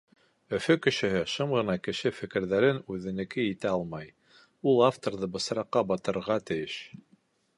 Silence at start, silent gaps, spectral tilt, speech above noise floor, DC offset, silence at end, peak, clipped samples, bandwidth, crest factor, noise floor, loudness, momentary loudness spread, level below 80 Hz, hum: 0.5 s; none; -5.5 dB/octave; 38 dB; under 0.1%; 0.6 s; -8 dBFS; under 0.1%; 11.5 kHz; 20 dB; -66 dBFS; -29 LUFS; 10 LU; -62 dBFS; none